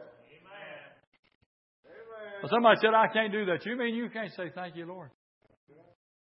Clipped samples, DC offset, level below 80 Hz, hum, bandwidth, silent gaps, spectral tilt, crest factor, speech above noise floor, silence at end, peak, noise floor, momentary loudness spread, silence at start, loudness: under 0.1%; under 0.1%; -84 dBFS; none; 5.8 kHz; 1.07-1.12 s, 1.19-1.23 s, 1.35-1.83 s; -8.5 dB/octave; 24 dB; 27 dB; 1.15 s; -8 dBFS; -55 dBFS; 24 LU; 0 s; -28 LUFS